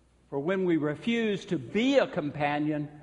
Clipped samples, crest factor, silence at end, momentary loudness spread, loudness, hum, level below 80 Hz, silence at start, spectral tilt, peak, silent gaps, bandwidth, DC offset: under 0.1%; 18 dB; 0 s; 7 LU; -29 LUFS; none; -64 dBFS; 0.3 s; -6.5 dB/octave; -10 dBFS; none; 10.5 kHz; under 0.1%